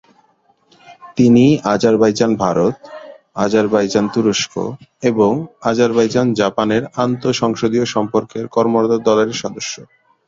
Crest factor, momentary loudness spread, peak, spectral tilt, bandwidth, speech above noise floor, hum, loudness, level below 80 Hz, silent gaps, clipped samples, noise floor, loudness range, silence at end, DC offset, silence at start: 16 dB; 12 LU; 0 dBFS; -5.5 dB/octave; 7.8 kHz; 42 dB; none; -16 LUFS; -52 dBFS; none; under 0.1%; -57 dBFS; 2 LU; 0.45 s; under 0.1%; 0.9 s